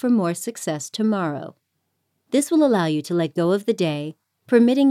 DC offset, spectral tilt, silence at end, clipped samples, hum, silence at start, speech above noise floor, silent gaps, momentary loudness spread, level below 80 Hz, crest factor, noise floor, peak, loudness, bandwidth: under 0.1%; -5.5 dB/octave; 0 s; under 0.1%; none; 0.05 s; 54 dB; none; 10 LU; -72 dBFS; 16 dB; -74 dBFS; -4 dBFS; -21 LUFS; 15 kHz